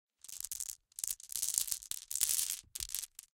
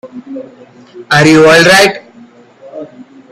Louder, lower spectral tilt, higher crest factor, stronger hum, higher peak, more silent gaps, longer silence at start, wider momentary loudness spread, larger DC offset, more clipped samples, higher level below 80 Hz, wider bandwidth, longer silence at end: second, -36 LUFS vs -5 LUFS; second, 2.5 dB/octave vs -4 dB/octave; first, 30 dB vs 10 dB; neither; second, -10 dBFS vs 0 dBFS; neither; first, 0.25 s vs 0.05 s; second, 11 LU vs 24 LU; neither; second, under 0.1% vs 0.4%; second, -66 dBFS vs -46 dBFS; about the same, 17 kHz vs 15.5 kHz; second, 0.15 s vs 0.3 s